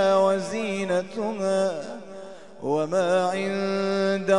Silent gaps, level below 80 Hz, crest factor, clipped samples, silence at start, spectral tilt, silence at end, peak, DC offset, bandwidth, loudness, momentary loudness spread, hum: none; -72 dBFS; 16 dB; under 0.1%; 0 s; -5.5 dB/octave; 0 s; -8 dBFS; 0.4%; 11 kHz; -25 LUFS; 15 LU; none